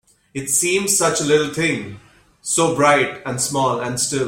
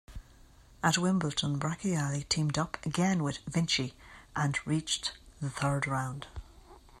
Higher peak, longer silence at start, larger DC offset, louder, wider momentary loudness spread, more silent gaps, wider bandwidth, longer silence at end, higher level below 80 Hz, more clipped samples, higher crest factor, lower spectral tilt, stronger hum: first, -2 dBFS vs -14 dBFS; first, 0.35 s vs 0.1 s; neither; first, -18 LUFS vs -31 LUFS; about the same, 12 LU vs 11 LU; neither; first, 16.5 kHz vs 13 kHz; second, 0 s vs 0.2 s; about the same, -54 dBFS vs -54 dBFS; neither; about the same, 18 dB vs 20 dB; second, -3 dB/octave vs -4.5 dB/octave; neither